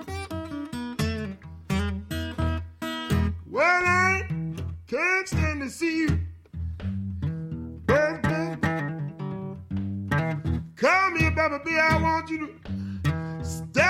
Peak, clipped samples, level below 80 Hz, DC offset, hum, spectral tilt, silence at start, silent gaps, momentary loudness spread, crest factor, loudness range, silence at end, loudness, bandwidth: -10 dBFS; under 0.1%; -40 dBFS; under 0.1%; none; -6 dB/octave; 0 s; none; 13 LU; 16 dB; 4 LU; 0 s; -26 LUFS; 15.5 kHz